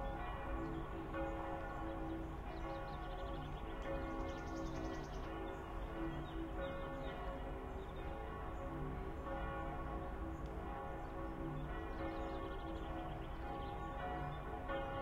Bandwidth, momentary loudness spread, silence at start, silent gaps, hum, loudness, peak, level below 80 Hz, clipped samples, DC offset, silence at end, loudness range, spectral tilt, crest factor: 15.5 kHz; 3 LU; 0 s; none; none; -46 LUFS; -32 dBFS; -50 dBFS; under 0.1%; under 0.1%; 0 s; 1 LU; -7 dB/octave; 14 dB